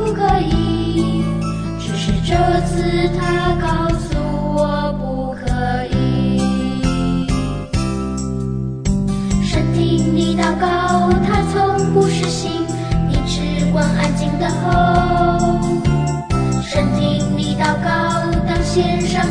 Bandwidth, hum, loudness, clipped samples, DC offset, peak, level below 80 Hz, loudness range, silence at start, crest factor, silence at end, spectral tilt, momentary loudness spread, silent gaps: 10 kHz; none; -17 LUFS; under 0.1%; under 0.1%; -2 dBFS; -26 dBFS; 3 LU; 0 s; 14 dB; 0 s; -6.5 dB/octave; 6 LU; none